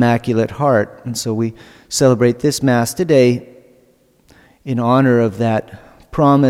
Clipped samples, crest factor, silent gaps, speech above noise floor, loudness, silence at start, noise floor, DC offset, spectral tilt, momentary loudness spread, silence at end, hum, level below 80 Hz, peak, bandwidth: under 0.1%; 14 dB; none; 39 dB; -16 LUFS; 0 s; -54 dBFS; under 0.1%; -6 dB/octave; 11 LU; 0 s; none; -48 dBFS; -2 dBFS; 16.5 kHz